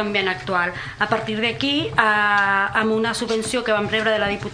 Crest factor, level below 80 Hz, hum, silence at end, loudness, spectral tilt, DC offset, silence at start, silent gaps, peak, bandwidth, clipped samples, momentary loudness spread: 20 dB; -50 dBFS; none; 0 s; -20 LUFS; -4 dB/octave; under 0.1%; 0 s; none; -2 dBFS; 11 kHz; under 0.1%; 5 LU